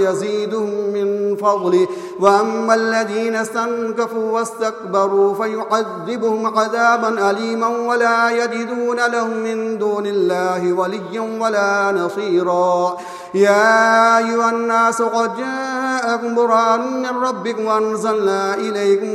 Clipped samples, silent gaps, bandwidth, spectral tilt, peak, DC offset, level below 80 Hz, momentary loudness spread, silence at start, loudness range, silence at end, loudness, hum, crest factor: under 0.1%; none; 13.5 kHz; -4.5 dB/octave; 0 dBFS; under 0.1%; -70 dBFS; 7 LU; 0 s; 4 LU; 0 s; -17 LUFS; none; 16 dB